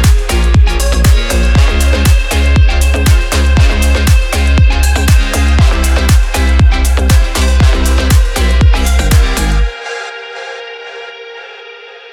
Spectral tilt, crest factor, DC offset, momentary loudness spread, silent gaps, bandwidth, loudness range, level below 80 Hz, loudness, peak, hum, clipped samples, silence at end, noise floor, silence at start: -5 dB/octave; 8 dB; under 0.1%; 15 LU; none; 16 kHz; 4 LU; -10 dBFS; -11 LUFS; 0 dBFS; none; under 0.1%; 0 s; -31 dBFS; 0 s